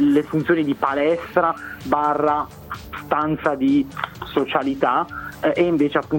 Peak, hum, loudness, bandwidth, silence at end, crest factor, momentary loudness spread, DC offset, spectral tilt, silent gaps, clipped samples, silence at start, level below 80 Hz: -4 dBFS; none; -21 LUFS; 17 kHz; 0 s; 16 dB; 11 LU; under 0.1%; -7 dB/octave; none; under 0.1%; 0 s; -48 dBFS